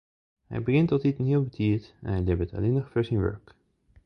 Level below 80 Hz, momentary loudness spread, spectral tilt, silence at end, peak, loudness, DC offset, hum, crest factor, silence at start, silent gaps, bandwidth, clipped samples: -42 dBFS; 8 LU; -10 dB/octave; 0.7 s; -10 dBFS; -27 LUFS; under 0.1%; none; 16 dB; 0.5 s; none; 6 kHz; under 0.1%